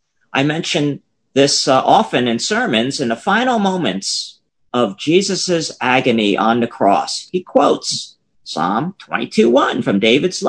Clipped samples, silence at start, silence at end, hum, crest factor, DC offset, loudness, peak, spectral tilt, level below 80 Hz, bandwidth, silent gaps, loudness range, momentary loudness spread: under 0.1%; 0.35 s; 0 s; none; 16 dB; under 0.1%; -16 LUFS; 0 dBFS; -4 dB/octave; -60 dBFS; 10.5 kHz; none; 2 LU; 9 LU